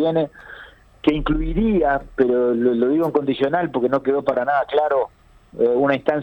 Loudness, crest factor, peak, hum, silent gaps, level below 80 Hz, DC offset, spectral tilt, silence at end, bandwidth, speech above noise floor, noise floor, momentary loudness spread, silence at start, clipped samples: -20 LUFS; 14 dB; -4 dBFS; none; none; -36 dBFS; under 0.1%; -8.5 dB/octave; 0 s; 18 kHz; 25 dB; -44 dBFS; 7 LU; 0 s; under 0.1%